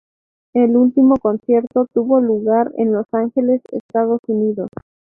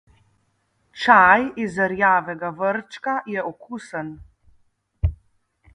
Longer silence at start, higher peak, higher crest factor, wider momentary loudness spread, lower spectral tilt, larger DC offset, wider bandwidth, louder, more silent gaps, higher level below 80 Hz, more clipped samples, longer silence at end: second, 0.55 s vs 0.95 s; about the same, -2 dBFS vs 0 dBFS; second, 14 dB vs 22 dB; second, 8 LU vs 18 LU; first, -11.5 dB/octave vs -6 dB/octave; neither; second, 3.1 kHz vs 10.5 kHz; first, -16 LUFS vs -20 LUFS; first, 3.80-3.89 s, 4.19-4.23 s vs none; second, -58 dBFS vs -38 dBFS; neither; second, 0.45 s vs 0.6 s